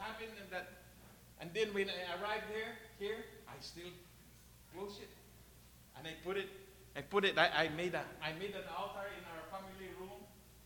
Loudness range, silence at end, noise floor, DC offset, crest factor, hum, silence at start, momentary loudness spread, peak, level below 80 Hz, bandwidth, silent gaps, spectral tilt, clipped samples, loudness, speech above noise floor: 11 LU; 0 s; -62 dBFS; under 0.1%; 28 dB; none; 0 s; 25 LU; -14 dBFS; -66 dBFS; 19 kHz; none; -4 dB/octave; under 0.1%; -41 LUFS; 20 dB